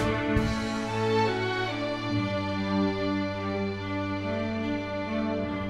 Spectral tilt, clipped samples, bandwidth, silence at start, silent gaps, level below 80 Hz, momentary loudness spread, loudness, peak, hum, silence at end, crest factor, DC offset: -6.5 dB/octave; under 0.1%; 12 kHz; 0 s; none; -44 dBFS; 5 LU; -29 LUFS; -12 dBFS; none; 0 s; 18 dB; under 0.1%